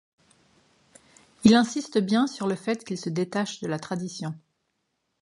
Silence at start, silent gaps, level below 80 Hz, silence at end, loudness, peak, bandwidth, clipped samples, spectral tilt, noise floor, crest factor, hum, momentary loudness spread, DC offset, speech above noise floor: 1.4 s; none; -64 dBFS; 0.85 s; -26 LUFS; -4 dBFS; 11.5 kHz; under 0.1%; -5.5 dB/octave; -77 dBFS; 24 dB; none; 14 LU; under 0.1%; 52 dB